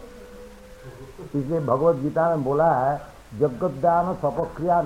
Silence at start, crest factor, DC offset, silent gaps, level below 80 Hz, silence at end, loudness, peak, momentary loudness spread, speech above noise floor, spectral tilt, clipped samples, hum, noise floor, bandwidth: 0 s; 16 dB; under 0.1%; none; -50 dBFS; 0 s; -23 LUFS; -8 dBFS; 23 LU; 21 dB; -8.5 dB/octave; under 0.1%; none; -43 dBFS; 15.5 kHz